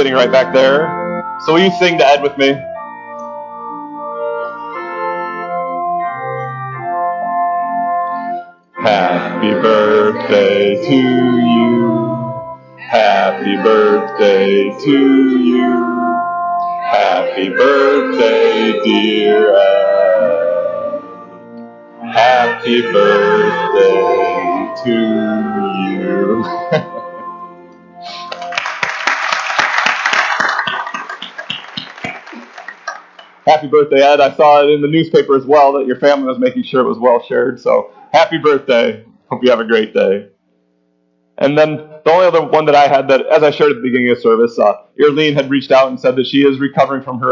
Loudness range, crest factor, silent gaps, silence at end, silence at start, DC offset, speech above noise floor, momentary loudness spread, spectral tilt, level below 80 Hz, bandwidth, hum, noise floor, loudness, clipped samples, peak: 8 LU; 14 dB; none; 0 s; 0 s; under 0.1%; 48 dB; 16 LU; -5.5 dB/octave; -60 dBFS; 7.4 kHz; none; -59 dBFS; -13 LUFS; under 0.1%; 0 dBFS